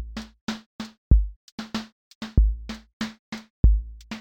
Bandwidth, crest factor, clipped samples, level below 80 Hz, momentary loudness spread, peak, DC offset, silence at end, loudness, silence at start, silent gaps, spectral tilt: 8 kHz; 20 dB; under 0.1%; -26 dBFS; 17 LU; -4 dBFS; under 0.1%; 0 s; -27 LUFS; 0 s; 0.41-0.48 s, 0.66-0.79 s, 0.98-1.11 s, 1.36-1.58 s, 1.92-2.21 s, 2.93-3.00 s, 3.19-3.32 s, 3.50-3.63 s; -6.5 dB/octave